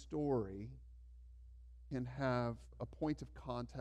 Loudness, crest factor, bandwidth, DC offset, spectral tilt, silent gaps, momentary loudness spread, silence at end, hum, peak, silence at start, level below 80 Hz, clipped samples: -42 LUFS; 18 dB; 9.4 kHz; under 0.1%; -8 dB/octave; none; 22 LU; 0 s; 60 Hz at -55 dBFS; -24 dBFS; 0 s; -58 dBFS; under 0.1%